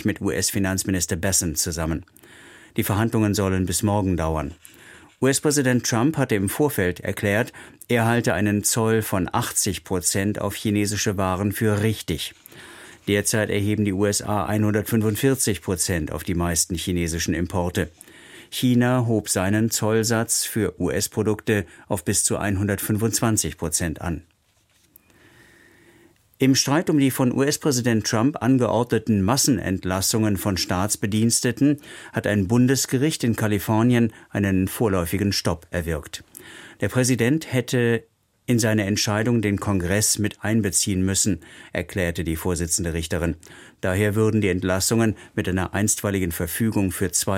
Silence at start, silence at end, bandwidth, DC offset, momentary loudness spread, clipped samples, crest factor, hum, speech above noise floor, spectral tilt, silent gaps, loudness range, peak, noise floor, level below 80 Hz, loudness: 0 s; 0 s; 16.5 kHz; under 0.1%; 8 LU; under 0.1%; 18 dB; none; 41 dB; -4.5 dB/octave; none; 3 LU; -6 dBFS; -63 dBFS; -44 dBFS; -22 LUFS